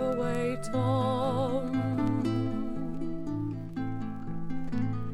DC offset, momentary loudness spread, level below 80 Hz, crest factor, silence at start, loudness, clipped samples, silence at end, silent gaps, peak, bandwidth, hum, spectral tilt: under 0.1%; 8 LU; -46 dBFS; 14 dB; 0 s; -31 LUFS; under 0.1%; 0 s; none; -16 dBFS; 12 kHz; none; -8 dB/octave